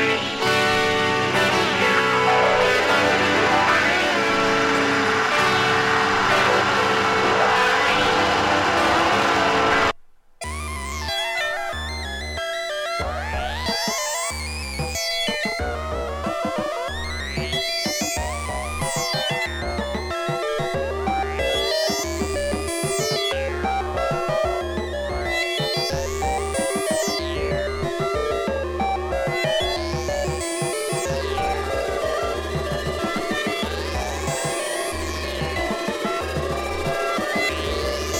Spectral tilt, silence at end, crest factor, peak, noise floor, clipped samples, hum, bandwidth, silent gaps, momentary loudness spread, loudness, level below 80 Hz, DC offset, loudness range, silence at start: -3.5 dB/octave; 0 s; 18 dB; -4 dBFS; -45 dBFS; under 0.1%; none; 19 kHz; none; 9 LU; -21 LUFS; -36 dBFS; under 0.1%; 7 LU; 0 s